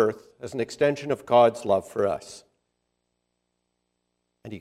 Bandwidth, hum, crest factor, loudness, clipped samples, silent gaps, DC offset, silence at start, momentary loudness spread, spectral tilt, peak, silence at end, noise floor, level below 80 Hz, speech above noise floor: 13 kHz; 60 Hz at -60 dBFS; 20 dB; -24 LUFS; under 0.1%; none; under 0.1%; 0 s; 19 LU; -5.5 dB/octave; -6 dBFS; 0 s; -78 dBFS; -68 dBFS; 54 dB